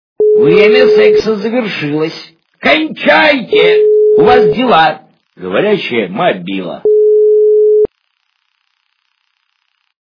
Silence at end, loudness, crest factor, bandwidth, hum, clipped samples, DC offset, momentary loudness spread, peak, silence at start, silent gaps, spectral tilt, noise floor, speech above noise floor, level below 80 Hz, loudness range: 2.15 s; -9 LUFS; 10 dB; 5.4 kHz; none; 0.4%; under 0.1%; 10 LU; 0 dBFS; 0.2 s; none; -6.5 dB/octave; -63 dBFS; 54 dB; -50 dBFS; 3 LU